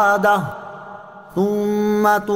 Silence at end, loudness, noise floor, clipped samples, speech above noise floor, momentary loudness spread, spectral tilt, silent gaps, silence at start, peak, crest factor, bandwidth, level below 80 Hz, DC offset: 0 s; -18 LUFS; -38 dBFS; under 0.1%; 21 dB; 20 LU; -6 dB/octave; none; 0 s; -4 dBFS; 14 dB; 16 kHz; -56 dBFS; under 0.1%